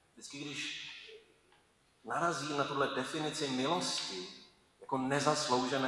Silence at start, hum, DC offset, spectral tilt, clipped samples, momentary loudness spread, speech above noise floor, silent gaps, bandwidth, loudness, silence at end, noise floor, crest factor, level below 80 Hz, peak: 0.15 s; none; under 0.1%; -3.5 dB/octave; under 0.1%; 17 LU; 35 dB; none; 12 kHz; -35 LUFS; 0 s; -69 dBFS; 24 dB; -74 dBFS; -14 dBFS